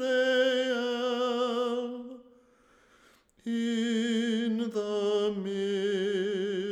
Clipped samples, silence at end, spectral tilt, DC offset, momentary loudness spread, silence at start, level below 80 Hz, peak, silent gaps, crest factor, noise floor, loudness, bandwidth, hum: under 0.1%; 0 s; -4.5 dB/octave; under 0.1%; 8 LU; 0 s; -76 dBFS; -14 dBFS; none; 14 dB; -63 dBFS; -29 LUFS; 12.5 kHz; none